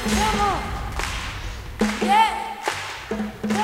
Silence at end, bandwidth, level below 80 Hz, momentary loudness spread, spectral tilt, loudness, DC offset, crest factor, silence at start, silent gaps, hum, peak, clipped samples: 0 s; 16 kHz; -34 dBFS; 11 LU; -4 dB/octave; -23 LUFS; under 0.1%; 18 dB; 0 s; none; none; -6 dBFS; under 0.1%